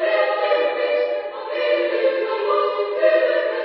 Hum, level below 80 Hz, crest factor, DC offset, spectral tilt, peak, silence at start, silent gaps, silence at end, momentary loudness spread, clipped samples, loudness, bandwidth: none; -78 dBFS; 16 dB; under 0.1%; -6 dB/octave; -4 dBFS; 0 s; none; 0 s; 6 LU; under 0.1%; -20 LUFS; 5.8 kHz